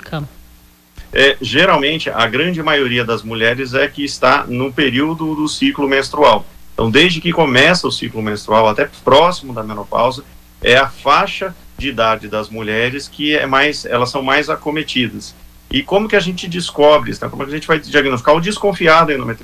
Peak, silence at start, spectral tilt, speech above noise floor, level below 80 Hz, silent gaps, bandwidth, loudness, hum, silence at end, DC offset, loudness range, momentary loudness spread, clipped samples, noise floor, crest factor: 0 dBFS; 0.05 s; -4.5 dB/octave; 31 dB; -40 dBFS; none; 15.5 kHz; -14 LUFS; none; 0 s; under 0.1%; 3 LU; 11 LU; under 0.1%; -45 dBFS; 14 dB